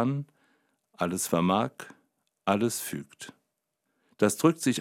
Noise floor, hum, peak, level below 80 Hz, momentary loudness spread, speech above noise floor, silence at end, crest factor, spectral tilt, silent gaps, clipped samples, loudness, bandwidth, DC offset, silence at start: -80 dBFS; none; -8 dBFS; -72 dBFS; 21 LU; 53 dB; 0 s; 22 dB; -5 dB/octave; none; under 0.1%; -28 LUFS; 16.5 kHz; under 0.1%; 0 s